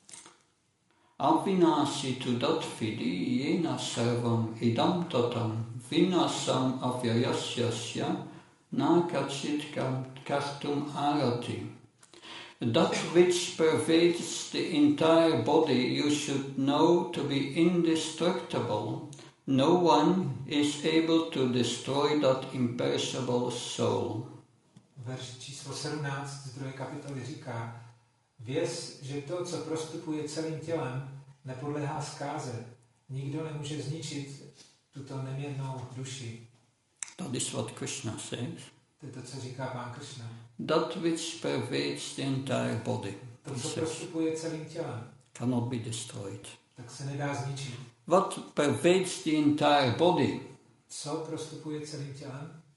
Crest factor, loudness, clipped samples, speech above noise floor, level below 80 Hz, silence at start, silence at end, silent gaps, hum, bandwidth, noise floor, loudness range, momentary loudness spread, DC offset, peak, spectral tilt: 20 dB; -30 LUFS; under 0.1%; 41 dB; -72 dBFS; 0.1 s; 0.15 s; none; none; 11.5 kHz; -71 dBFS; 12 LU; 17 LU; under 0.1%; -10 dBFS; -5 dB/octave